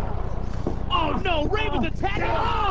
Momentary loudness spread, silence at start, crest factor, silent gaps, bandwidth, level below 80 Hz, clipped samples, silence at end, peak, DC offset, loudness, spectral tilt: 7 LU; 0 s; 14 dB; none; 7.8 kHz; -30 dBFS; under 0.1%; 0 s; -10 dBFS; 4%; -25 LUFS; -6.5 dB/octave